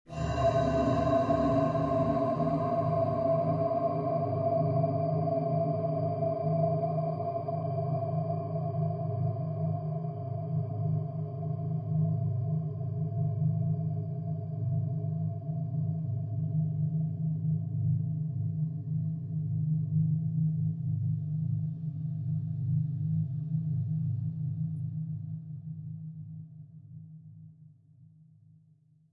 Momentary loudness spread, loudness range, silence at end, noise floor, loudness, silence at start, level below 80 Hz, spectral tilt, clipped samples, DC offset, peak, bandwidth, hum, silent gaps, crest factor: 8 LU; 7 LU; 1.05 s; -63 dBFS; -31 LUFS; 0.1 s; -56 dBFS; -10 dB/octave; under 0.1%; under 0.1%; -14 dBFS; 7.4 kHz; none; none; 16 dB